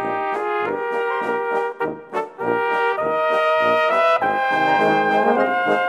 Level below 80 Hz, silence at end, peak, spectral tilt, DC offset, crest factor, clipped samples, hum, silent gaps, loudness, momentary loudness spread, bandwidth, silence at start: -66 dBFS; 0 s; -6 dBFS; -5.5 dB/octave; under 0.1%; 14 dB; under 0.1%; none; none; -19 LUFS; 7 LU; 14 kHz; 0 s